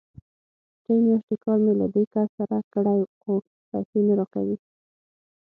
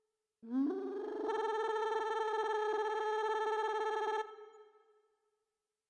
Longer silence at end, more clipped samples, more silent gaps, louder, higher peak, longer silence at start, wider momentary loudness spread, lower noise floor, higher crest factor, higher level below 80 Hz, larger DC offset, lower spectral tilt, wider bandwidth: second, 0.85 s vs 1.25 s; neither; first, 1.23-1.28 s, 2.07-2.11 s, 2.29-2.38 s, 2.64-2.71 s, 3.07-3.21 s, 3.47-3.72 s, 3.85-3.93 s vs none; first, -24 LUFS vs -36 LUFS; first, -12 dBFS vs -24 dBFS; first, 0.9 s vs 0.45 s; about the same, 8 LU vs 6 LU; about the same, under -90 dBFS vs -90 dBFS; about the same, 12 dB vs 14 dB; first, -66 dBFS vs -88 dBFS; neither; first, -13 dB/octave vs -3 dB/octave; second, 1.9 kHz vs 9.4 kHz